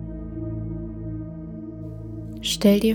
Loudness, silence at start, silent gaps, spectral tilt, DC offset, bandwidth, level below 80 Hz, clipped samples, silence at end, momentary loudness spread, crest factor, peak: -27 LUFS; 0 s; none; -5.5 dB/octave; under 0.1%; 19.5 kHz; -40 dBFS; under 0.1%; 0 s; 17 LU; 20 dB; -6 dBFS